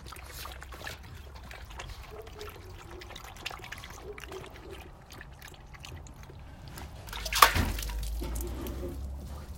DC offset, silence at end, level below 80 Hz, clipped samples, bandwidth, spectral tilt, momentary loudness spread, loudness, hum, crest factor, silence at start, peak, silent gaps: under 0.1%; 0 s; -42 dBFS; under 0.1%; 16.5 kHz; -3 dB/octave; 16 LU; -33 LUFS; none; 36 dB; 0 s; 0 dBFS; none